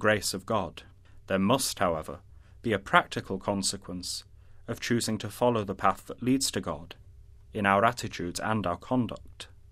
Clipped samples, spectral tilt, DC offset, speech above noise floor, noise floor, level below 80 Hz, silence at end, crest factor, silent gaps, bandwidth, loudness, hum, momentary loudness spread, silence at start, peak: under 0.1%; -4 dB/octave; under 0.1%; 23 dB; -51 dBFS; -54 dBFS; 0.25 s; 26 dB; none; 15.5 kHz; -29 LUFS; none; 16 LU; 0 s; -4 dBFS